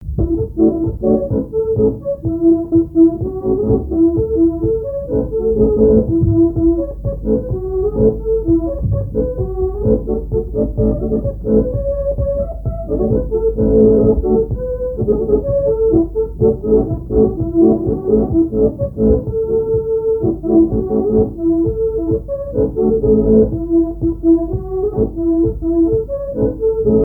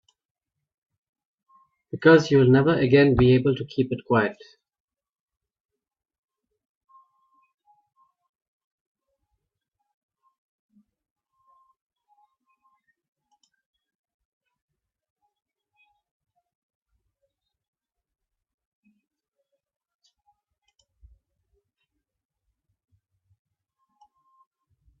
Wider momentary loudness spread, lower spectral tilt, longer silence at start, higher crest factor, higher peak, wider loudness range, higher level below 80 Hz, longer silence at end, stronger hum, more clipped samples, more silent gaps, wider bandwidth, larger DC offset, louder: second, 7 LU vs 11 LU; first, -14 dB/octave vs -7.5 dB/octave; second, 0 s vs 1.95 s; second, 14 dB vs 24 dB; first, 0 dBFS vs -4 dBFS; second, 3 LU vs 11 LU; first, -26 dBFS vs -54 dBFS; second, 0 s vs 20.7 s; neither; neither; neither; second, 1.6 kHz vs 7.4 kHz; neither; first, -16 LUFS vs -20 LUFS